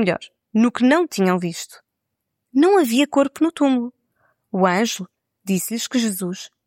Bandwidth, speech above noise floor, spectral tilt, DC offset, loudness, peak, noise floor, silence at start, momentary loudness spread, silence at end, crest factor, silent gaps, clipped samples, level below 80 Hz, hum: 16.5 kHz; 60 dB; -5 dB/octave; under 0.1%; -20 LUFS; -4 dBFS; -79 dBFS; 0 s; 14 LU; 0.2 s; 16 dB; none; under 0.1%; -70 dBFS; none